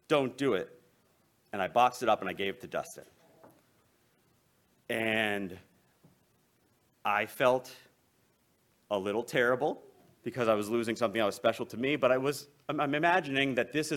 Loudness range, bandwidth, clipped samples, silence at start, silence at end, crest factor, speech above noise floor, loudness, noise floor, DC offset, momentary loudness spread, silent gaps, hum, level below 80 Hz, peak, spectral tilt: 7 LU; 17.5 kHz; under 0.1%; 0.1 s; 0 s; 22 dB; 40 dB; -31 LUFS; -71 dBFS; under 0.1%; 14 LU; none; none; -72 dBFS; -12 dBFS; -4.5 dB/octave